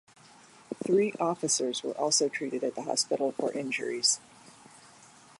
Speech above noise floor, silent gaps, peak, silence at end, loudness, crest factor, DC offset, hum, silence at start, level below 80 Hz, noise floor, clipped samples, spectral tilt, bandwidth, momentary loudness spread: 26 dB; none; -12 dBFS; 0.85 s; -29 LUFS; 18 dB; under 0.1%; none; 0.7 s; -80 dBFS; -55 dBFS; under 0.1%; -2 dB/octave; 11.5 kHz; 7 LU